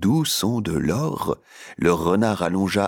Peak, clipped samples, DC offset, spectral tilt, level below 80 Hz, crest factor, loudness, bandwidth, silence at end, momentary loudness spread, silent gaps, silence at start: -6 dBFS; under 0.1%; under 0.1%; -5.5 dB/octave; -46 dBFS; 16 dB; -22 LUFS; 19 kHz; 0 s; 8 LU; none; 0 s